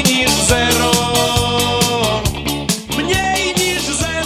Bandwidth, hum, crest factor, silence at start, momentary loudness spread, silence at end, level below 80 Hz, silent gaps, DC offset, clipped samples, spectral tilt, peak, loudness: 17 kHz; none; 16 dB; 0 s; 6 LU; 0 s; -30 dBFS; none; under 0.1%; under 0.1%; -3 dB/octave; 0 dBFS; -15 LUFS